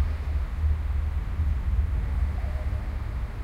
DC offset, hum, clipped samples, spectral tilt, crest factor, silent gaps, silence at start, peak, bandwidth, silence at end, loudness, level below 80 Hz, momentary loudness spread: under 0.1%; none; under 0.1%; -8 dB/octave; 12 dB; none; 0 s; -14 dBFS; 5.2 kHz; 0 s; -29 LUFS; -28 dBFS; 5 LU